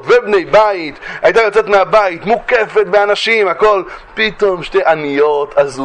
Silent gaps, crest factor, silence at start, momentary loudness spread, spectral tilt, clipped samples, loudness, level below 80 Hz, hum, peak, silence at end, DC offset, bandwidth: none; 12 dB; 0 s; 6 LU; -4.5 dB/octave; under 0.1%; -12 LUFS; -44 dBFS; none; 0 dBFS; 0 s; under 0.1%; 9.6 kHz